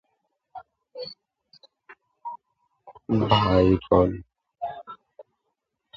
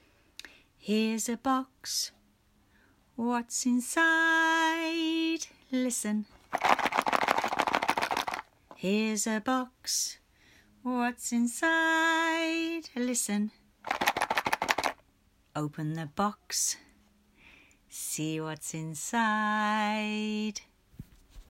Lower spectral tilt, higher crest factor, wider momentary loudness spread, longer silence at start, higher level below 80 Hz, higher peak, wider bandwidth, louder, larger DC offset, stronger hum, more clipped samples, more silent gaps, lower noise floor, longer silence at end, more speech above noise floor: first, -8.5 dB/octave vs -3 dB/octave; about the same, 22 dB vs 26 dB; first, 26 LU vs 12 LU; about the same, 0.55 s vs 0.45 s; first, -44 dBFS vs -66 dBFS; about the same, -4 dBFS vs -4 dBFS; second, 7.4 kHz vs 16 kHz; first, -22 LUFS vs -30 LUFS; neither; neither; neither; neither; first, -79 dBFS vs -67 dBFS; first, 0.75 s vs 0.05 s; first, 59 dB vs 37 dB